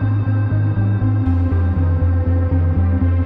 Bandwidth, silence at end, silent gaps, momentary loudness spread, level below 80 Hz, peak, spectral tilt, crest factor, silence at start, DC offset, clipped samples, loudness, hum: 3.9 kHz; 0 s; none; 1 LU; -26 dBFS; -6 dBFS; -12 dB/octave; 10 dB; 0 s; under 0.1%; under 0.1%; -17 LUFS; none